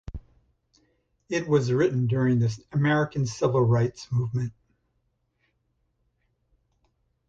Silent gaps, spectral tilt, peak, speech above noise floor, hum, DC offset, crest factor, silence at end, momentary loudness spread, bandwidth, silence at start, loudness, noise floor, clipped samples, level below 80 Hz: none; -7 dB/octave; -8 dBFS; 50 dB; none; under 0.1%; 18 dB; 2.8 s; 9 LU; 7.8 kHz; 0.1 s; -25 LUFS; -73 dBFS; under 0.1%; -52 dBFS